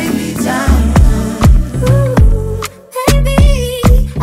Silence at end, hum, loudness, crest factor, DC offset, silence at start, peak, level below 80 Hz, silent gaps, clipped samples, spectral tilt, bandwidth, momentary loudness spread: 0 s; none; -12 LUFS; 10 dB; under 0.1%; 0 s; 0 dBFS; -12 dBFS; none; under 0.1%; -6 dB/octave; 16 kHz; 6 LU